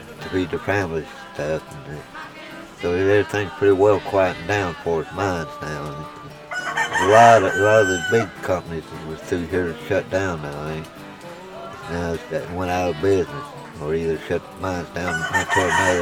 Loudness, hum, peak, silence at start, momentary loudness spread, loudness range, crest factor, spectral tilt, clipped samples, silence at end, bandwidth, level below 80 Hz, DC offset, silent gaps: -21 LUFS; none; 0 dBFS; 0 s; 19 LU; 9 LU; 22 dB; -5 dB/octave; under 0.1%; 0 s; 16.5 kHz; -48 dBFS; under 0.1%; none